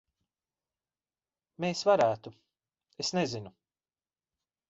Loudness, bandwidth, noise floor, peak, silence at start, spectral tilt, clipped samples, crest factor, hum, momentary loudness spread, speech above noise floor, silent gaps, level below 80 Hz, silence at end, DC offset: -30 LUFS; 8 kHz; under -90 dBFS; -12 dBFS; 1.6 s; -4.5 dB/octave; under 0.1%; 22 dB; none; 19 LU; over 61 dB; none; -72 dBFS; 1.2 s; under 0.1%